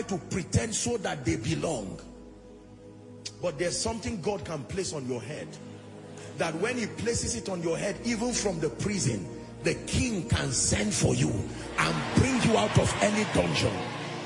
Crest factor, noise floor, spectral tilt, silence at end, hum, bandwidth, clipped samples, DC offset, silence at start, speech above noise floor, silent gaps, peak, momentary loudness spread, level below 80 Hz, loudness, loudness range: 20 dB; -49 dBFS; -4.5 dB/octave; 0 s; none; 11 kHz; under 0.1%; under 0.1%; 0 s; 20 dB; none; -10 dBFS; 17 LU; -48 dBFS; -29 LUFS; 8 LU